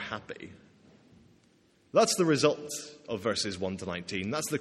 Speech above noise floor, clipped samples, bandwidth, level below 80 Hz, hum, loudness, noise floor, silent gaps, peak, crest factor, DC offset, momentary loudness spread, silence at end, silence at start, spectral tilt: 35 dB; under 0.1%; 15.5 kHz; -68 dBFS; none; -30 LUFS; -65 dBFS; none; -10 dBFS; 22 dB; under 0.1%; 15 LU; 0 s; 0 s; -4 dB/octave